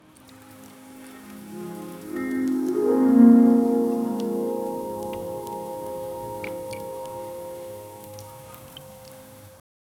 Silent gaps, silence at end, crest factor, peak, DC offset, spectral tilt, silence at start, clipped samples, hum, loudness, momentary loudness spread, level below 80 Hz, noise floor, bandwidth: none; 0.5 s; 20 dB; -4 dBFS; under 0.1%; -7 dB/octave; 0.3 s; under 0.1%; none; -23 LUFS; 26 LU; -62 dBFS; -49 dBFS; 17 kHz